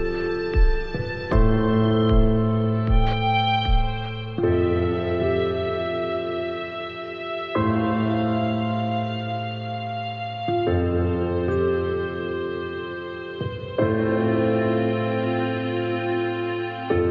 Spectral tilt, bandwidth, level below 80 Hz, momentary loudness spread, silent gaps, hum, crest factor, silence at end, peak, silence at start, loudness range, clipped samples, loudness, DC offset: -9 dB/octave; 5.6 kHz; -30 dBFS; 10 LU; none; none; 16 dB; 0 s; -6 dBFS; 0 s; 4 LU; under 0.1%; -24 LUFS; under 0.1%